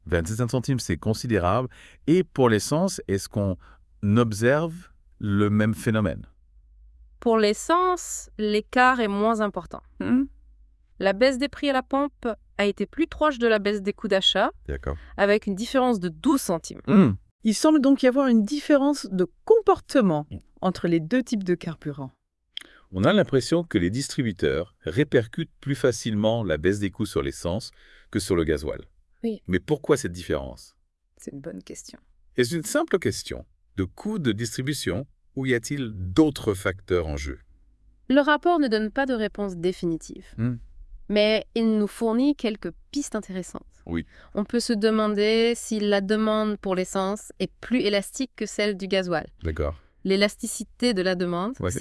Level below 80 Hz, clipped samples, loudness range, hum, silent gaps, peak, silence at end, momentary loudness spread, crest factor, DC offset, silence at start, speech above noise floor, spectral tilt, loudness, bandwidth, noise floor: -48 dBFS; under 0.1%; 6 LU; none; 17.31-17.39 s; -6 dBFS; 0 s; 13 LU; 20 dB; under 0.1%; 0.05 s; 33 dB; -5.5 dB/octave; -24 LUFS; 12 kHz; -57 dBFS